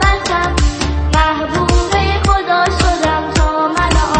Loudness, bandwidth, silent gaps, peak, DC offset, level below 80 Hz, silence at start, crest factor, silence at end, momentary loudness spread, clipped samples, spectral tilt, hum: -14 LUFS; 8.8 kHz; none; 0 dBFS; under 0.1%; -18 dBFS; 0 s; 14 dB; 0 s; 2 LU; under 0.1%; -4.5 dB/octave; none